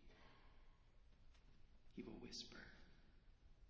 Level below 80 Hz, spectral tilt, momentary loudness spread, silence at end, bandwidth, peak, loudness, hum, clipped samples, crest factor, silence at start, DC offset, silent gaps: -70 dBFS; -3 dB/octave; 15 LU; 0 s; 7 kHz; -42 dBFS; -57 LUFS; none; under 0.1%; 20 dB; 0 s; under 0.1%; none